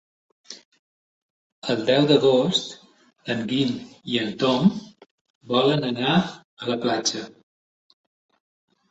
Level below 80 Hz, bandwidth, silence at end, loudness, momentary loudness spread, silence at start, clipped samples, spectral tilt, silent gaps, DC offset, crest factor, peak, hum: -64 dBFS; 8.2 kHz; 1.6 s; -22 LUFS; 20 LU; 0.5 s; under 0.1%; -5 dB/octave; 0.65-0.72 s, 0.79-1.62 s, 5.11-5.41 s, 6.44-6.57 s; under 0.1%; 20 dB; -4 dBFS; none